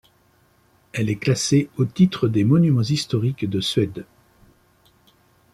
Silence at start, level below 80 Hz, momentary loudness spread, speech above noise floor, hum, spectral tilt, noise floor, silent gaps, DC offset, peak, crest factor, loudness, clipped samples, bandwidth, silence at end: 0.95 s; -56 dBFS; 9 LU; 40 dB; none; -6 dB/octave; -59 dBFS; none; under 0.1%; -4 dBFS; 18 dB; -21 LUFS; under 0.1%; 13.5 kHz; 1.5 s